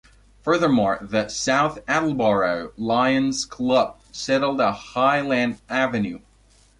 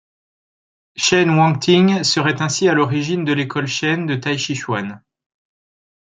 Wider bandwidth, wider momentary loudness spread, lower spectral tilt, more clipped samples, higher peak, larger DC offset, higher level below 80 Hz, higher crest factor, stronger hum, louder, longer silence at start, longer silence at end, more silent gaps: first, 11.5 kHz vs 9.4 kHz; about the same, 8 LU vs 9 LU; about the same, -4.5 dB/octave vs -4.5 dB/octave; neither; second, -8 dBFS vs -2 dBFS; neither; first, -52 dBFS vs -60 dBFS; about the same, 14 dB vs 16 dB; neither; second, -22 LUFS vs -17 LUFS; second, 0.45 s vs 0.95 s; second, 0.6 s vs 1.2 s; neither